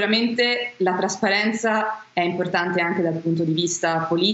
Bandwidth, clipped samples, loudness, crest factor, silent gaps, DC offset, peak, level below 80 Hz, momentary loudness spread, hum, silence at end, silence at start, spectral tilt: 8.2 kHz; under 0.1%; -22 LUFS; 14 dB; none; under 0.1%; -6 dBFS; -70 dBFS; 4 LU; none; 0 s; 0 s; -4 dB/octave